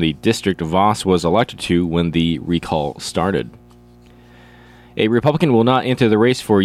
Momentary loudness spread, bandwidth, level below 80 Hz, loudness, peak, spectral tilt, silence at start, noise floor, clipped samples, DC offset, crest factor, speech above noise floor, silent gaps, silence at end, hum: 7 LU; 14.5 kHz; -44 dBFS; -17 LUFS; -2 dBFS; -6 dB/octave; 0 s; -45 dBFS; under 0.1%; under 0.1%; 14 dB; 29 dB; none; 0 s; 60 Hz at -45 dBFS